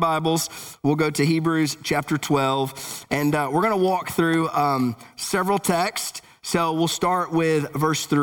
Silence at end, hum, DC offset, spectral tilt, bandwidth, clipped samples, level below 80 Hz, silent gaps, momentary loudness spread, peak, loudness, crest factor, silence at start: 0 s; none; under 0.1%; -5 dB/octave; over 20 kHz; under 0.1%; -58 dBFS; none; 6 LU; -6 dBFS; -22 LUFS; 16 dB; 0 s